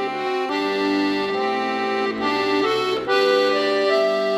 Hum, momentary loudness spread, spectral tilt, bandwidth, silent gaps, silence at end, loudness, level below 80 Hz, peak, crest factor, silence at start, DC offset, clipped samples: none; 5 LU; -4 dB/octave; 13.5 kHz; none; 0 s; -20 LUFS; -60 dBFS; -6 dBFS; 14 dB; 0 s; under 0.1%; under 0.1%